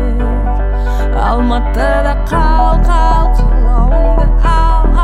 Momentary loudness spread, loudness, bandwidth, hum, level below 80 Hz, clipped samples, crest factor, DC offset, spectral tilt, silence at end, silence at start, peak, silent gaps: 4 LU; -13 LUFS; 4.8 kHz; none; -10 dBFS; under 0.1%; 8 dB; under 0.1%; -7.5 dB/octave; 0 s; 0 s; 0 dBFS; none